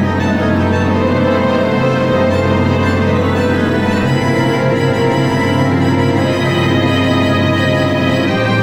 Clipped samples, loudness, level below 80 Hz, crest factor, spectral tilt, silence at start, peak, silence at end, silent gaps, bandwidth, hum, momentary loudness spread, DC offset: under 0.1%; -13 LUFS; -40 dBFS; 12 dB; -7 dB/octave; 0 s; -2 dBFS; 0 s; none; 15.5 kHz; none; 1 LU; under 0.1%